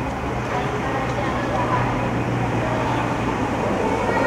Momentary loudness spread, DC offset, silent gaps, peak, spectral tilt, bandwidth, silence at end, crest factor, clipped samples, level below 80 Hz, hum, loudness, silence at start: 3 LU; under 0.1%; none; -8 dBFS; -6.5 dB/octave; 13.5 kHz; 0 s; 14 dB; under 0.1%; -36 dBFS; none; -22 LUFS; 0 s